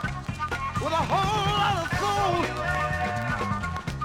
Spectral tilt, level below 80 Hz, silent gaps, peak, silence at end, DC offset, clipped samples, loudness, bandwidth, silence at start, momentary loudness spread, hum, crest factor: -5 dB/octave; -42 dBFS; none; -12 dBFS; 0 s; under 0.1%; under 0.1%; -26 LUFS; 16.5 kHz; 0 s; 7 LU; none; 14 dB